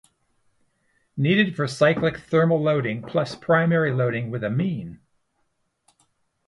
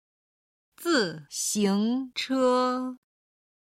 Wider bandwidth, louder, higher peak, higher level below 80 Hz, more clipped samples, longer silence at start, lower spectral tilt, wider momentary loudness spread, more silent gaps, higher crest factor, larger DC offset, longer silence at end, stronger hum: second, 11.5 kHz vs 16.5 kHz; first, -22 LUFS vs -26 LUFS; first, -6 dBFS vs -12 dBFS; first, -60 dBFS vs -74 dBFS; neither; first, 1.15 s vs 0.8 s; first, -7 dB/octave vs -3.5 dB/octave; about the same, 8 LU vs 8 LU; neither; about the same, 18 dB vs 16 dB; neither; first, 1.5 s vs 0.8 s; neither